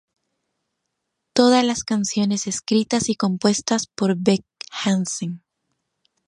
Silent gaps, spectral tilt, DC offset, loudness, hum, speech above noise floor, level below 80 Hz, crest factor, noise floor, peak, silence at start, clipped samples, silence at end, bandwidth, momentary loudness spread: none; -4.5 dB/octave; under 0.1%; -21 LUFS; none; 57 dB; -60 dBFS; 20 dB; -78 dBFS; -2 dBFS; 1.35 s; under 0.1%; 0.9 s; 11.5 kHz; 10 LU